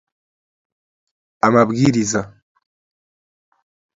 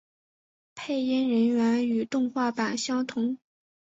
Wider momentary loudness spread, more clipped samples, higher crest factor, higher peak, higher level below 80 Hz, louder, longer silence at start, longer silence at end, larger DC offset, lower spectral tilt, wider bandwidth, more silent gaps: about the same, 10 LU vs 8 LU; neither; first, 22 dB vs 14 dB; first, 0 dBFS vs -14 dBFS; first, -54 dBFS vs -72 dBFS; first, -16 LUFS vs -27 LUFS; first, 1.45 s vs 0.75 s; first, 1.65 s vs 0.5 s; neither; about the same, -5.5 dB/octave vs -4.5 dB/octave; about the same, 7.8 kHz vs 8 kHz; neither